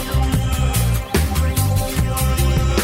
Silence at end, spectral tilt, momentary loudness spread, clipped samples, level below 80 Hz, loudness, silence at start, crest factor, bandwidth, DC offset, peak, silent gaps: 0 s; -5 dB/octave; 2 LU; under 0.1%; -20 dBFS; -19 LUFS; 0 s; 12 dB; 16.5 kHz; under 0.1%; -6 dBFS; none